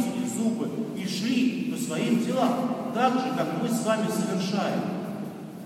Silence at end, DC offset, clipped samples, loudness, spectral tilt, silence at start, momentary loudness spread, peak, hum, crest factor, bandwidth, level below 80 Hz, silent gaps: 0 s; under 0.1%; under 0.1%; -27 LUFS; -5.5 dB/octave; 0 s; 7 LU; -10 dBFS; none; 18 dB; 16 kHz; -74 dBFS; none